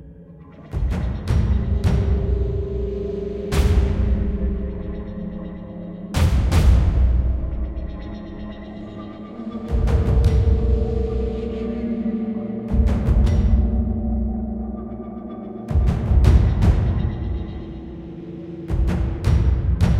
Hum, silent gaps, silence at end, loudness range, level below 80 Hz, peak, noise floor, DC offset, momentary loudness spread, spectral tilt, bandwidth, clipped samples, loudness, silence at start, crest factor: none; none; 0 s; 3 LU; -22 dBFS; 0 dBFS; -42 dBFS; under 0.1%; 16 LU; -8 dB/octave; 10.5 kHz; under 0.1%; -22 LUFS; 0 s; 18 dB